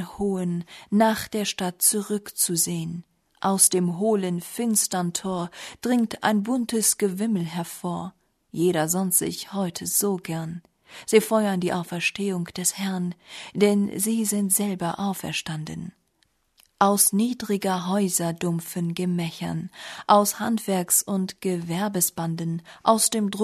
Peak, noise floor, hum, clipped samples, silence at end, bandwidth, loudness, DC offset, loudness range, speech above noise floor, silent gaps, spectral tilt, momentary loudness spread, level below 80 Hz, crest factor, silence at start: -4 dBFS; -68 dBFS; none; under 0.1%; 0 s; 13.5 kHz; -24 LUFS; under 0.1%; 3 LU; 44 dB; none; -4 dB/octave; 12 LU; -62 dBFS; 22 dB; 0 s